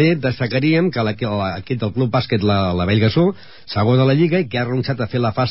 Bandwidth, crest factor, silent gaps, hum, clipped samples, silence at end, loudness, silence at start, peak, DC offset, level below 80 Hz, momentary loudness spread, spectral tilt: 5.8 kHz; 12 dB; none; none; under 0.1%; 0 s; -18 LUFS; 0 s; -4 dBFS; 0.8%; -40 dBFS; 7 LU; -11.5 dB/octave